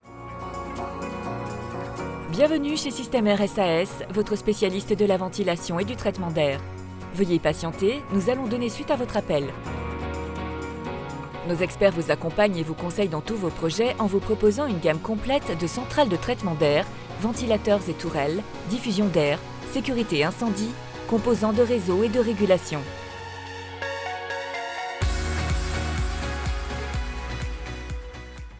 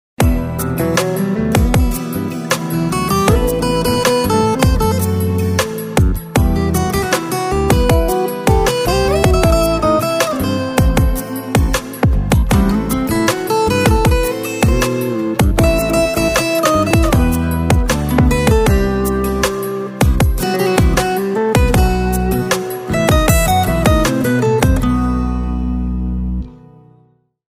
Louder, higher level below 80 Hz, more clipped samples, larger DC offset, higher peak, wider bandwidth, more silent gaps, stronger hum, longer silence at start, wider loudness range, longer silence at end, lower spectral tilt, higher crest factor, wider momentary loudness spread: second, -26 LUFS vs -15 LUFS; second, -38 dBFS vs -20 dBFS; neither; neither; second, -6 dBFS vs 0 dBFS; second, 8 kHz vs 16 kHz; neither; neither; second, 0.05 s vs 0.2 s; first, 5 LU vs 2 LU; second, 0 s vs 1 s; about the same, -5.5 dB/octave vs -5.5 dB/octave; first, 20 dB vs 14 dB; first, 11 LU vs 6 LU